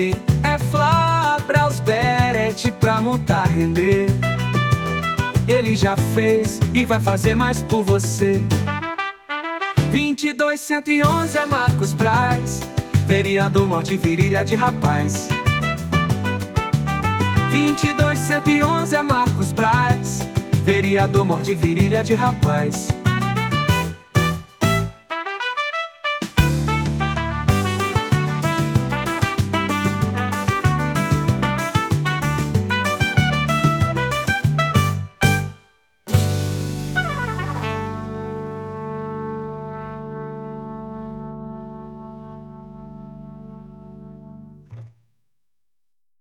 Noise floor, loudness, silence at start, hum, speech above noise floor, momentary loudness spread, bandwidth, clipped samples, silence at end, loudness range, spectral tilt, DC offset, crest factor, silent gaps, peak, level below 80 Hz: -86 dBFS; -19 LUFS; 0 s; none; 69 dB; 13 LU; 19 kHz; under 0.1%; 1.35 s; 12 LU; -6 dB/octave; under 0.1%; 18 dB; none; 0 dBFS; -38 dBFS